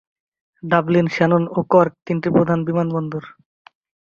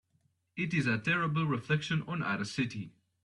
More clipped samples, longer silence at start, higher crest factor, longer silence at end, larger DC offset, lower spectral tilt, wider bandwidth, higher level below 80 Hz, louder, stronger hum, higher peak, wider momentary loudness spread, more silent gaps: neither; about the same, 0.65 s vs 0.55 s; about the same, 18 dB vs 18 dB; first, 0.75 s vs 0.35 s; neither; first, -8.5 dB/octave vs -6 dB/octave; second, 7 kHz vs 11 kHz; first, -56 dBFS vs -68 dBFS; first, -18 LUFS vs -32 LUFS; neither; first, -2 dBFS vs -16 dBFS; about the same, 10 LU vs 10 LU; first, 2.02-2.06 s vs none